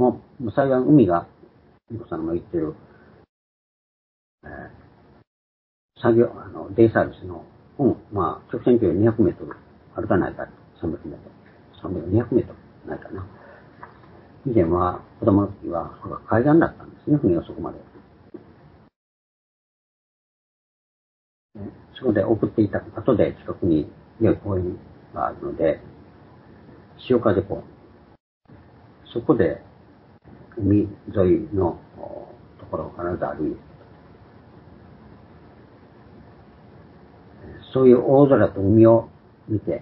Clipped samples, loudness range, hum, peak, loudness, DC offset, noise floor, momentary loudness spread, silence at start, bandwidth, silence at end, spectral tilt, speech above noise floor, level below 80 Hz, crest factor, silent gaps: under 0.1%; 11 LU; none; -2 dBFS; -21 LUFS; under 0.1%; -53 dBFS; 22 LU; 0 s; 4.5 kHz; 0 s; -13 dB/octave; 32 dB; -46 dBFS; 22 dB; 3.29-4.38 s, 5.27-5.89 s, 18.96-21.49 s, 28.20-28.41 s